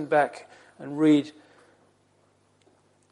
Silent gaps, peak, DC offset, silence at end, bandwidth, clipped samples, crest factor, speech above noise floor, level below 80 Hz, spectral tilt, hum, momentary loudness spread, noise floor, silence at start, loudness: none; -10 dBFS; under 0.1%; 1.8 s; 10.5 kHz; under 0.1%; 18 dB; 41 dB; -80 dBFS; -6.5 dB/octave; none; 22 LU; -65 dBFS; 0 s; -24 LUFS